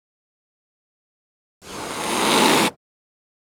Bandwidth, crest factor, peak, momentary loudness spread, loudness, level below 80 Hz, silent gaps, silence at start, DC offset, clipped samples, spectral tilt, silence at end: over 20 kHz; 24 dB; -2 dBFS; 17 LU; -18 LUFS; -58 dBFS; none; 1.65 s; under 0.1%; under 0.1%; -2.5 dB/octave; 0.7 s